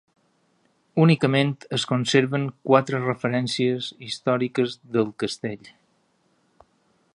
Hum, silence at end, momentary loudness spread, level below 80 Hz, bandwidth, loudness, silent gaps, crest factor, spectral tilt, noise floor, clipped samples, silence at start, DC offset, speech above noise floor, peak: none; 1.6 s; 10 LU; -68 dBFS; 11 kHz; -23 LUFS; none; 22 dB; -6 dB/octave; -66 dBFS; under 0.1%; 0.95 s; under 0.1%; 44 dB; -2 dBFS